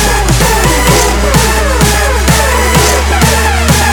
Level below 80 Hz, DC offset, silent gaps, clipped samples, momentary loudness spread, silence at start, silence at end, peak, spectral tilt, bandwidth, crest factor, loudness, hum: -14 dBFS; under 0.1%; none; 0.4%; 1 LU; 0 s; 0 s; 0 dBFS; -3.5 dB/octave; over 20 kHz; 8 dB; -8 LUFS; none